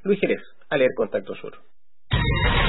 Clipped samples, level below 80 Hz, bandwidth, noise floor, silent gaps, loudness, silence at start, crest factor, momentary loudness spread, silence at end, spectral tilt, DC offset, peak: under 0.1%; -32 dBFS; 4.1 kHz; -66 dBFS; none; -24 LUFS; 0.05 s; 16 dB; 15 LU; 0 s; -10.5 dB/octave; 1%; -8 dBFS